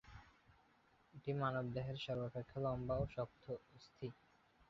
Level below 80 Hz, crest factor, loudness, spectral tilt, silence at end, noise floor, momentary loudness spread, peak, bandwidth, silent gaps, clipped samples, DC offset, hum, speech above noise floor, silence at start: -64 dBFS; 18 dB; -45 LUFS; -6 dB/octave; 0.55 s; -73 dBFS; 17 LU; -26 dBFS; 7.2 kHz; none; under 0.1%; under 0.1%; none; 30 dB; 0.05 s